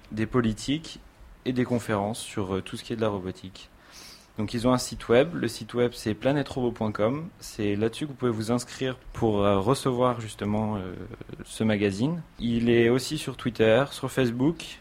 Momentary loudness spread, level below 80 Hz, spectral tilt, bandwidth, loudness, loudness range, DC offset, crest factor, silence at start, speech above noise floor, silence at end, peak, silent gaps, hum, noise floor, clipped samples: 15 LU; -50 dBFS; -6 dB/octave; 16 kHz; -27 LUFS; 5 LU; under 0.1%; 20 dB; 0.05 s; 22 dB; 0 s; -8 dBFS; none; none; -48 dBFS; under 0.1%